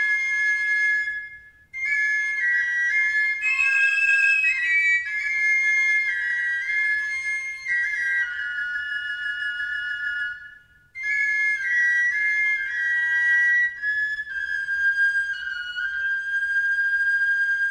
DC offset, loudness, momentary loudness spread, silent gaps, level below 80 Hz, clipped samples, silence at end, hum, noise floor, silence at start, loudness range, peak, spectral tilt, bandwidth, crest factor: under 0.1%; -21 LUFS; 9 LU; none; -64 dBFS; under 0.1%; 0 s; none; -49 dBFS; 0 s; 6 LU; -10 dBFS; 1.5 dB/octave; 11.5 kHz; 14 dB